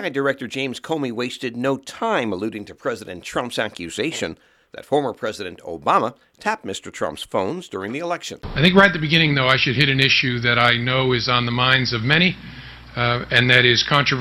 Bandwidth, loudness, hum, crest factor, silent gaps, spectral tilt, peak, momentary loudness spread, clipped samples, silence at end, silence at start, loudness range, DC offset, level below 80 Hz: 14.5 kHz; -19 LUFS; none; 20 dB; none; -5 dB/octave; 0 dBFS; 14 LU; under 0.1%; 0 s; 0 s; 9 LU; under 0.1%; -48 dBFS